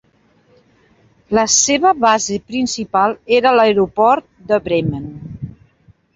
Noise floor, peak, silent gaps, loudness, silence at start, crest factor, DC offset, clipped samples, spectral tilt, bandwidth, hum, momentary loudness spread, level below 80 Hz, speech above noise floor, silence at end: -55 dBFS; 0 dBFS; none; -15 LUFS; 1.3 s; 16 dB; under 0.1%; under 0.1%; -3 dB/octave; 8 kHz; none; 18 LU; -48 dBFS; 41 dB; 0.65 s